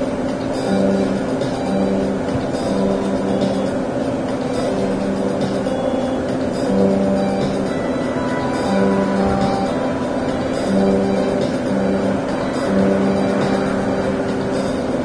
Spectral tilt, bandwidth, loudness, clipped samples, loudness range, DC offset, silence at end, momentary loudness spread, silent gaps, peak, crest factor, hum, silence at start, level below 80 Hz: -7 dB/octave; 11 kHz; -19 LUFS; under 0.1%; 2 LU; under 0.1%; 0 s; 4 LU; none; -2 dBFS; 16 dB; none; 0 s; -40 dBFS